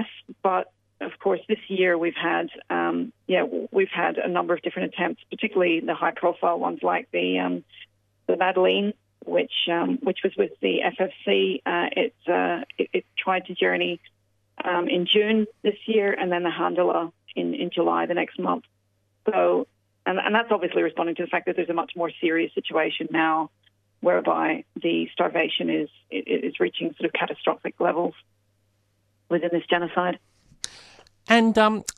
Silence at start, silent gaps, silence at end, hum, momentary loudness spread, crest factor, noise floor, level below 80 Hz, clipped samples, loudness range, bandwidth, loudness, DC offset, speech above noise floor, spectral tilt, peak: 0 s; none; 0.05 s; none; 8 LU; 22 dB; -68 dBFS; -70 dBFS; under 0.1%; 2 LU; 11.5 kHz; -24 LUFS; under 0.1%; 45 dB; -5 dB/octave; -4 dBFS